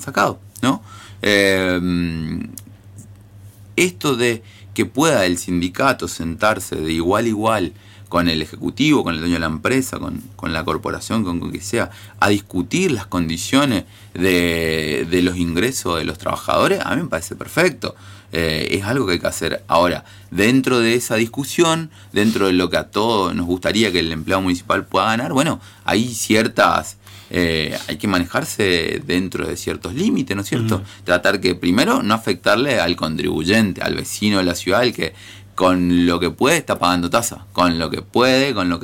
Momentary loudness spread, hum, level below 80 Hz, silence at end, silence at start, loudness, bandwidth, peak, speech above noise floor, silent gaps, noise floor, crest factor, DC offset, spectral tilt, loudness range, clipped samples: 8 LU; none; -44 dBFS; 0 s; 0 s; -18 LUFS; 17 kHz; -2 dBFS; 23 dB; none; -41 dBFS; 16 dB; under 0.1%; -4.5 dB/octave; 3 LU; under 0.1%